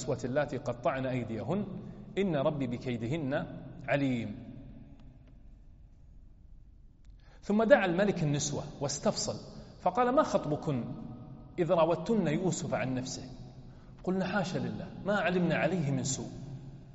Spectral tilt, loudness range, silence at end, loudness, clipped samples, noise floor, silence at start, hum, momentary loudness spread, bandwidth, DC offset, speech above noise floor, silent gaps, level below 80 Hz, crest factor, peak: -5.5 dB/octave; 7 LU; 0 s; -32 LUFS; under 0.1%; -55 dBFS; 0 s; none; 18 LU; 8 kHz; under 0.1%; 24 dB; none; -56 dBFS; 24 dB; -10 dBFS